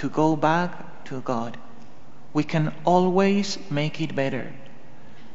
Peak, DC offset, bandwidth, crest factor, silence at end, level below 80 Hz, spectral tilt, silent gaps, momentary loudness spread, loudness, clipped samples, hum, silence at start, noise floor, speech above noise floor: -6 dBFS; 3%; 8 kHz; 18 dB; 0.1 s; -62 dBFS; -5.5 dB/octave; none; 16 LU; -24 LUFS; under 0.1%; none; 0 s; -50 dBFS; 26 dB